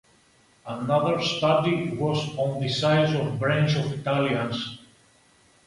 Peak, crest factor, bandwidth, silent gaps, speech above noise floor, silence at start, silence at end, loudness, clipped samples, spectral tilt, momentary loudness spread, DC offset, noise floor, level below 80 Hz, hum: -10 dBFS; 16 dB; 11.5 kHz; none; 36 dB; 0.65 s; 0.9 s; -24 LUFS; under 0.1%; -6 dB/octave; 11 LU; under 0.1%; -60 dBFS; -58 dBFS; none